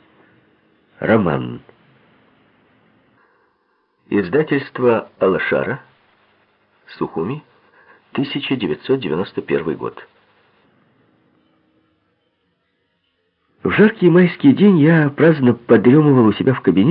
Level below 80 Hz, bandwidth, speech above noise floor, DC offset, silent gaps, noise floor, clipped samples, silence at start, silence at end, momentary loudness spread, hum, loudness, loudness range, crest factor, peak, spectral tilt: -56 dBFS; 5.2 kHz; 52 dB; under 0.1%; none; -67 dBFS; under 0.1%; 1 s; 0 s; 14 LU; none; -16 LUFS; 13 LU; 18 dB; 0 dBFS; -12.5 dB/octave